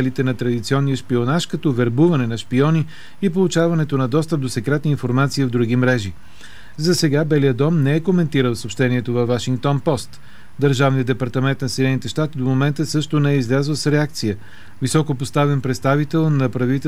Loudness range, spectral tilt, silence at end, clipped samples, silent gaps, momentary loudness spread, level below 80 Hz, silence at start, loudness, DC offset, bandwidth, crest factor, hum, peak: 2 LU; -6.5 dB/octave; 0 s; under 0.1%; none; 5 LU; -52 dBFS; 0 s; -19 LUFS; 2%; 14.5 kHz; 14 dB; none; -4 dBFS